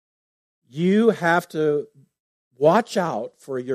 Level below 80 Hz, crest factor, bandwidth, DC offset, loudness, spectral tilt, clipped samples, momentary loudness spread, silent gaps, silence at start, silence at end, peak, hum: -72 dBFS; 18 dB; 15 kHz; under 0.1%; -21 LUFS; -6.5 dB/octave; under 0.1%; 13 LU; 2.20-2.51 s; 0.75 s; 0 s; -4 dBFS; none